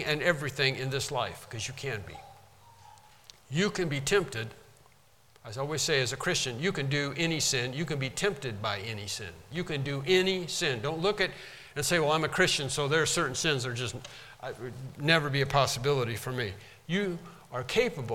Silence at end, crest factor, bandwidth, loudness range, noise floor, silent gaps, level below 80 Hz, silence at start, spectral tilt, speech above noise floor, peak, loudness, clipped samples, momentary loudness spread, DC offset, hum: 0 s; 22 dB; 17 kHz; 6 LU; -62 dBFS; none; -56 dBFS; 0 s; -3.5 dB/octave; 32 dB; -8 dBFS; -29 LUFS; under 0.1%; 14 LU; under 0.1%; none